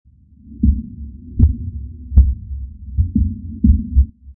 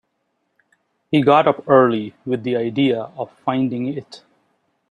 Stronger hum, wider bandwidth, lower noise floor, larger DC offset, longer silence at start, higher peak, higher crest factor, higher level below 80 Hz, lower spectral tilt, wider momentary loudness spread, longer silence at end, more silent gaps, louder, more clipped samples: neither; second, 0.8 kHz vs 9.6 kHz; second, -42 dBFS vs -71 dBFS; neither; second, 0.45 s vs 1.1 s; about the same, 0 dBFS vs -2 dBFS; about the same, 16 dB vs 18 dB; first, -20 dBFS vs -64 dBFS; first, -16 dB/octave vs -8 dB/octave; first, 16 LU vs 12 LU; second, 0.05 s vs 0.75 s; neither; about the same, -18 LUFS vs -18 LUFS; neither